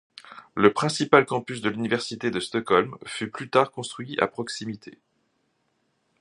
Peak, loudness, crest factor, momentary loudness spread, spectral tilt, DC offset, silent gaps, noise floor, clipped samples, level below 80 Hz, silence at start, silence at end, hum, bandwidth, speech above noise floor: -2 dBFS; -24 LUFS; 24 dB; 15 LU; -4.5 dB/octave; under 0.1%; none; -72 dBFS; under 0.1%; -64 dBFS; 0.25 s; 1.3 s; none; 11.5 kHz; 47 dB